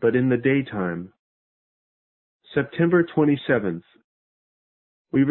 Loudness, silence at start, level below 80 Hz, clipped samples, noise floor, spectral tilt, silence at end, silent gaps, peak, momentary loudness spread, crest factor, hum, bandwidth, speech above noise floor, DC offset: -22 LUFS; 0 s; -60 dBFS; under 0.1%; under -90 dBFS; -12 dB/octave; 0 s; 1.19-2.40 s, 4.04-5.05 s; -6 dBFS; 12 LU; 18 dB; none; 4.2 kHz; over 69 dB; under 0.1%